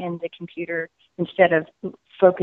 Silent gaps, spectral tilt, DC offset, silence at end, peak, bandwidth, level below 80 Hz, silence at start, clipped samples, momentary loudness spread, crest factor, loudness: none; -9 dB/octave; under 0.1%; 0 s; -2 dBFS; 4 kHz; -66 dBFS; 0 s; under 0.1%; 17 LU; 20 dB; -22 LUFS